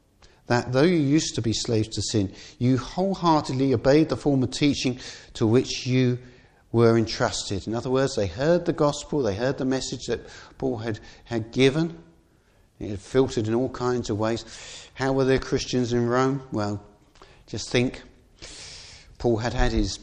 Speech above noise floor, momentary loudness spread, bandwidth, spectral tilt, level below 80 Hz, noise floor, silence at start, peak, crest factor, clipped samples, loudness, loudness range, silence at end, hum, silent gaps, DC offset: 36 dB; 15 LU; 10 kHz; -5.5 dB/octave; -42 dBFS; -60 dBFS; 0.5 s; -6 dBFS; 18 dB; under 0.1%; -24 LUFS; 5 LU; 0 s; none; none; under 0.1%